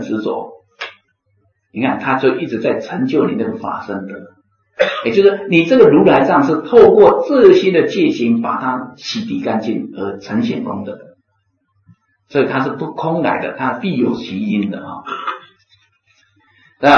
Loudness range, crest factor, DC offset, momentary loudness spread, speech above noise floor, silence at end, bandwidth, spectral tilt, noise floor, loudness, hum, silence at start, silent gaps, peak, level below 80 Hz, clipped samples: 12 LU; 16 dB; under 0.1%; 18 LU; 51 dB; 0 s; 7 kHz; -7 dB/octave; -65 dBFS; -15 LUFS; none; 0 s; none; 0 dBFS; -54 dBFS; 0.1%